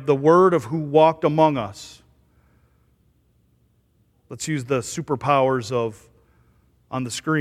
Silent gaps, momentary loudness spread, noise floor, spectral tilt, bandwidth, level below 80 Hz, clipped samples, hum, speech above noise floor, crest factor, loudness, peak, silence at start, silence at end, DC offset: none; 16 LU; -63 dBFS; -6 dB/octave; 14.5 kHz; -60 dBFS; under 0.1%; none; 43 dB; 20 dB; -20 LUFS; -2 dBFS; 0 s; 0 s; under 0.1%